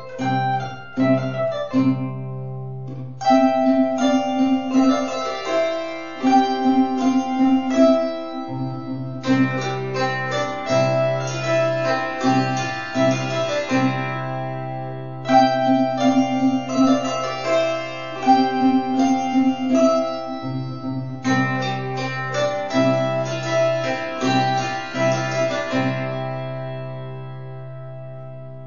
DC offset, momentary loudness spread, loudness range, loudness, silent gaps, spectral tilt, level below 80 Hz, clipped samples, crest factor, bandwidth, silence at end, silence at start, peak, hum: 1%; 12 LU; 3 LU; -21 LUFS; none; -6 dB/octave; -60 dBFS; under 0.1%; 16 dB; 7.2 kHz; 0 s; 0 s; -4 dBFS; none